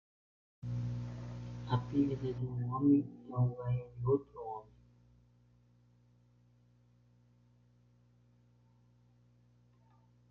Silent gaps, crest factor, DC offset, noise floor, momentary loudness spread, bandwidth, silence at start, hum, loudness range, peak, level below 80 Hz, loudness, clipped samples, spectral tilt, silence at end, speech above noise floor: none; 20 dB; under 0.1%; -67 dBFS; 15 LU; 6.6 kHz; 0.65 s; 60 Hz at -50 dBFS; 9 LU; -18 dBFS; -62 dBFS; -36 LUFS; under 0.1%; -10 dB/octave; 5.65 s; 34 dB